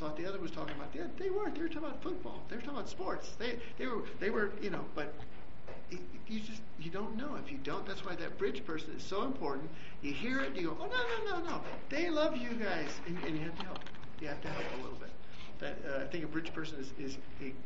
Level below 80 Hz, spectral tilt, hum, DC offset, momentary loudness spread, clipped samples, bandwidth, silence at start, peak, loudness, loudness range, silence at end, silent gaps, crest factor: -58 dBFS; -3.5 dB/octave; none; 2%; 12 LU; under 0.1%; 7.6 kHz; 0 s; -18 dBFS; -40 LUFS; 6 LU; 0 s; none; 20 dB